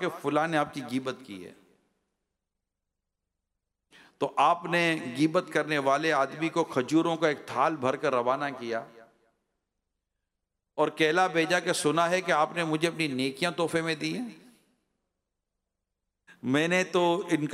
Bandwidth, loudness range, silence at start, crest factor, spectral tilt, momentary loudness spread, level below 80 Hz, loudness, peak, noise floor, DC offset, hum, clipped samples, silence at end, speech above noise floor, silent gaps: 15.5 kHz; 7 LU; 0 s; 18 dB; -4.5 dB/octave; 10 LU; -76 dBFS; -27 LUFS; -12 dBFS; -85 dBFS; under 0.1%; none; under 0.1%; 0 s; 58 dB; none